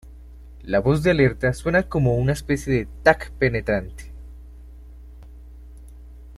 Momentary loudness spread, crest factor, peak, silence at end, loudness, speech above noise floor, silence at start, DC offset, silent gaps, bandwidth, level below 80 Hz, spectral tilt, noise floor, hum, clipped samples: 22 LU; 22 dB; -2 dBFS; 0 s; -21 LUFS; 21 dB; 0.05 s; under 0.1%; none; 13.5 kHz; -38 dBFS; -7 dB/octave; -42 dBFS; none; under 0.1%